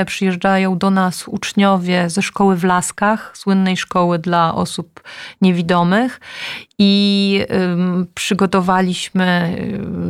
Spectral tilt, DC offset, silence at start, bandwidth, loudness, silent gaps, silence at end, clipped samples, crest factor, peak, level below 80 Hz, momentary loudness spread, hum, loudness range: -5.5 dB/octave; under 0.1%; 0 s; 13.5 kHz; -16 LUFS; none; 0 s; under 0.1%; 12 dB; -4 dBFS; -52 dBFS; 9 LU; none; 1 LU